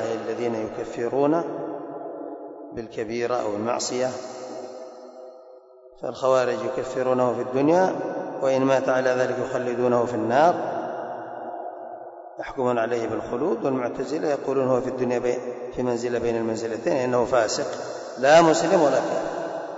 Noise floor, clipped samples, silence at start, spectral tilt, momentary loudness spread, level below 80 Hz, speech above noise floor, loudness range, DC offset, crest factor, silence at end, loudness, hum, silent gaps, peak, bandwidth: -48 dBFS; under 0.1%; 0 s; -5 dB/octave; 16 LU; -60 dBFS; 26 dB; 8 LU; under 0.1%; 18 dB; 0 s; -24 LUFS; none; none; -6 dBFS; 8 kHz